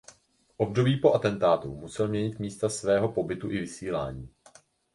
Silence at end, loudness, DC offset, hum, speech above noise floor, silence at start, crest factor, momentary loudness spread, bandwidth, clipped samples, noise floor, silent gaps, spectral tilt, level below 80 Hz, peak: 0.65 s; -28 LUFS; under 0.1%; none; 34 dB; 0.6 s; 20 dB; 10 LU; 11.5 kHz; under 0.1%; -61 dBFS; none; -6 dB/octave; -56 dBFS; -8 dBFS